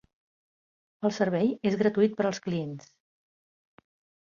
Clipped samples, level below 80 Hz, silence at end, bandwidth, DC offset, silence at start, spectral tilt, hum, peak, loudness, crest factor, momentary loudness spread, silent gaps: under 0.1%; -70 dBFS; 1.4 s; 7.4 kHz; under 0.1%; 1 s; -6.5 dB/octave; none; -12 dBFS; -27 LUFS; 18 dB; 9 LU; none